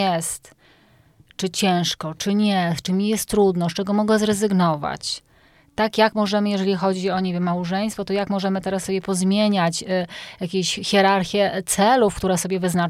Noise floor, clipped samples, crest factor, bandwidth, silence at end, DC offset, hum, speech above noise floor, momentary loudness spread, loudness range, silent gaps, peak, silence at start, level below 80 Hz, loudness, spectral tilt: -55 dBFS; under 0.1%; 18 dB; 15.5 kHz; 0 s; under 0.1%; none; 34 dB; 8 LU; 2 LU; none; -4 dBFS; 0 s; -52 dBFS; -21 LUFS; -4.5 dB/octave